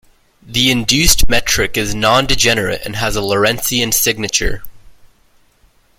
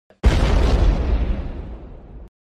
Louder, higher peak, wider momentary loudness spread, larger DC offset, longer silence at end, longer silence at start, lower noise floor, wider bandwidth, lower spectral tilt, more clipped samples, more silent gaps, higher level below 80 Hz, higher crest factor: first, -14 LUFS vs -20 LUFS; first, 0 dBFS vs -4 dBFS; second, 8 LU vs 21 LU; neither; first, 1.05 s vs 0.3 s; first, 0.45 s vs 0.25 s; first, -53 dBFS vs -37 dBFS; first, 17 kHz vs 9.4 kHz; second, -2.5 dB/octave vs -7 dB/octave; neither; neither; second, -26 dBFS vs -20 dBFS; about the same, 16 dB vs 16 dB